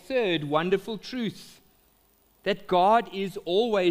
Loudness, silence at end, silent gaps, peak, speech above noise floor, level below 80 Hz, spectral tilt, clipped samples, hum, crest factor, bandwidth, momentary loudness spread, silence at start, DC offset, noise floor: -26 LUFS; 0 s; none; -8 dBFS; 38 dB; -62 dBFS; -6 dB/octave; under 0.1%; none; 18 dB; 15.5 kHz; 12 LU; 0.1 s; under 0.1%; -64 dBFS